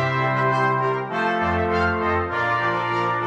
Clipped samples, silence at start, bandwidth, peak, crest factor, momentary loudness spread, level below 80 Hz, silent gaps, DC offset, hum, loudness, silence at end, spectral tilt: under 0.1%; 0 s; 8.8 kHz; -10 dBFS; 12 dB; 3 LU; -46 dBFS; none; under 0.1%; none; -21 LUFS; 0 s; -7 dB/octave